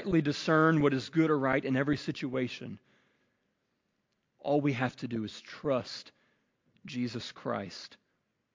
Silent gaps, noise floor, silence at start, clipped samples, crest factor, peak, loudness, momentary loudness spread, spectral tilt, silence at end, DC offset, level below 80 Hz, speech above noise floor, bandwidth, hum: none; -79 dBFS; 0 s; under 0.1%; 20 dB; -14 dBFS; -31 LUFS; 17 LU; -6.5 dB/octave; 0.6 s; under 0.1%; -64 dBFS; 49 dB; 7.6 kHz; none